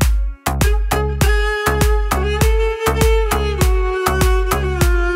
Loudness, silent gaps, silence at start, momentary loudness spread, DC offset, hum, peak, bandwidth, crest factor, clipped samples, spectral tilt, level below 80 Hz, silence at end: -17 LUFS; none; 0 s; 3 LU; under 0.1%; none; -2 dBFS; 16.5 kHz; 12 dB; under 0.1%; -5 dB/octave; -18 dBFS; 0 s